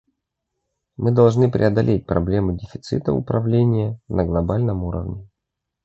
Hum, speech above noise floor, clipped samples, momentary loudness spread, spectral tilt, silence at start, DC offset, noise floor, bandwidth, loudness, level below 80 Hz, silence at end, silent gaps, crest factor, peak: none; 62 dB; under 0.1%; 11 LU; -9 dB/octave; 1 s; under 0.1%; -81 dBFS; 7.8 kHz; -20 LUFS; -38 dBFS; 0.6 s; none; 18 dB; -2 dBFS